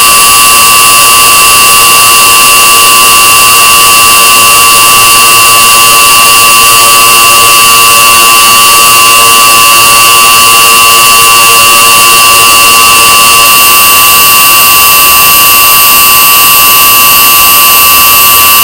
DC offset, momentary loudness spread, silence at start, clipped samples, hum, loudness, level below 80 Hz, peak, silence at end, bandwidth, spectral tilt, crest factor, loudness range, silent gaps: under 0.1%; 0 LU; 0 s; 40%; none; 1 LUFS; -32 dBFS; 0 dBFS; 0 s; over 20 kHz; 1 dB/octave; 2 dB; 0 LU; none